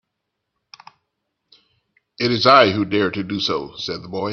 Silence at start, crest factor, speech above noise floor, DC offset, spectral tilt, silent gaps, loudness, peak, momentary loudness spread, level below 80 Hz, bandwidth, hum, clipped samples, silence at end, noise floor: 2.2 s; 22 dB; 60 dB; under 0.1%; -5.5 dB/octave; none; -18 LUFS; 0 dBFS; 15 LU; -60 dBFS; 7 kHz; none; under 0.1%; 0 s; -78 dBFS